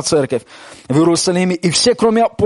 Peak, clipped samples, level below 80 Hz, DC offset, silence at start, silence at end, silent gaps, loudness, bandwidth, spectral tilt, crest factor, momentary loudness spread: -2 dBFS; under 0.1%; -50 dBFS; under 0.1%; 0 s; 0 s; none; -14 LUFS; 11.5 kHz; -4.5 dB/octave; 12 dB; 6 LU